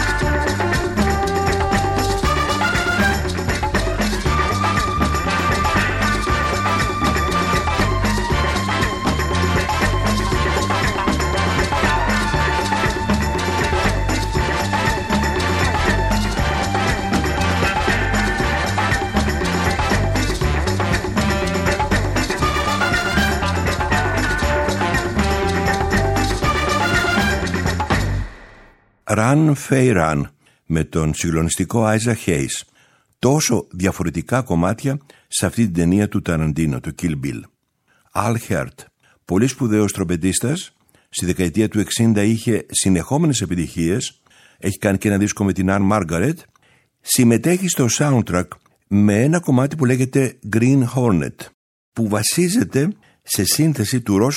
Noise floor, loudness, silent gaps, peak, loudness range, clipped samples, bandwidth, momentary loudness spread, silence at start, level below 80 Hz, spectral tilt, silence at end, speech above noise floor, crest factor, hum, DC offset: -62 dBFS; -18 LUFS; 51.54-51.92 s; 0 dBFS; 3 LU; under 0.1%; 16.5 kHz; 6 LU; 0 s; -28 dBFS; -5 dB/octave; 0 s; 45 dB; 18 dB; none; under 0.1%